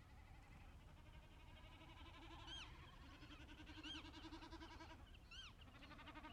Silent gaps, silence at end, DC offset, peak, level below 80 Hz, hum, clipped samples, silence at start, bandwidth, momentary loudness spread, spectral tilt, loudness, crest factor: none; 0 s; under 0.1%; -42 dBFS; -64 dBFS; none; under 0.1%; 0 s; 13.5 kHz; 10 LU; -4 dB/octave; -59 LUFS; 16 dB